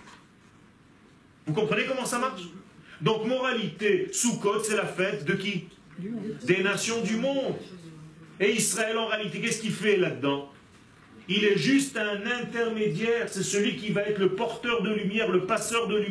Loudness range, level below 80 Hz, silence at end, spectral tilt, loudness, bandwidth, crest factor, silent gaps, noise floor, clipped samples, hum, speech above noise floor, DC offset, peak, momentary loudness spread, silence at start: 2 LU; -68 dBFS; 0 s; -4 dB/octave; -27 LUFS; 11 kHz; 18 dB; none; -56 dBFS; under 0.1%; none; 29 dB; under 0.1%; -10 dBFS; 11 LU; 0 s